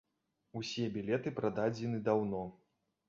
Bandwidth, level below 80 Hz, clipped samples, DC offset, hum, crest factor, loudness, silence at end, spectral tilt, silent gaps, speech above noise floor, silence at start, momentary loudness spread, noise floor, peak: 7.4 kHz; -70 dBFS; under 0.1%; under 0.1%; none; 20 dB; -36 LUFS; 0.55 s; -5.5 dB/octave; none; 47 dB; 0.55 s; 10 LU; -82 dBFS; -16 dBFS